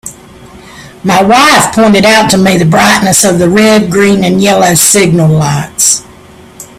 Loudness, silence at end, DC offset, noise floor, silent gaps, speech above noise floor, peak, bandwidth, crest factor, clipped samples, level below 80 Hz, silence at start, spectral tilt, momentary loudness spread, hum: -6 LUFS; 0.15 s; under 0.1%; -34 dBFS; none; 28 dB; 0 dBFS; over 20 kHz; 8 dB; 0.7%; -38 dBFS; 0.05 s; -4 dB/octave; 5 LU; none